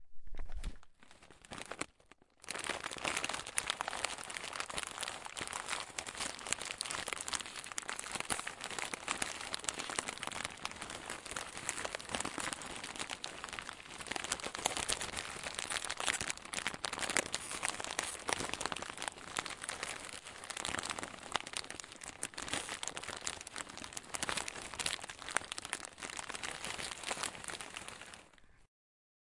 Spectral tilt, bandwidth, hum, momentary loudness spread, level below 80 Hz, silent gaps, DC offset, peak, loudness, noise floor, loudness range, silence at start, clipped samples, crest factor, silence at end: -0.5 dB/octave; 11.5 kHz; none; 9 LU; -58 dBFS; none; under 0.1%; -8 dBFS; -40 LUFS; -66 dBFS; 4 LU; 0 s; under 0.1%; 34 dB; 0.65 s